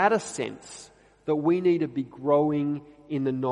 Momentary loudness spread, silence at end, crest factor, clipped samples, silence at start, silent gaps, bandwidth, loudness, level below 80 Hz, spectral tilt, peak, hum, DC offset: 15 LU; 0 s; 18 dB; under 0.1%; 0 s; none; 11 kHz; -26 LUFS; -66 dBFS; -6 dB/octave; -8 dBFS; 50 Hz at -50 dBFS; under 0.1%